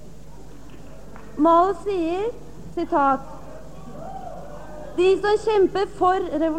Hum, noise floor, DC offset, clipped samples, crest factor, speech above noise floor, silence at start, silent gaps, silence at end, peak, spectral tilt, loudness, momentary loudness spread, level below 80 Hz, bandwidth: none; -43 dBFS; 1%; under 0.1%; 16 dB; 23 dB; 0 s; none; 0 s; -6 dBFS; -6 dB/octave; -21 LUFS; 22 LU; -46 dBFS; 9.8 kHz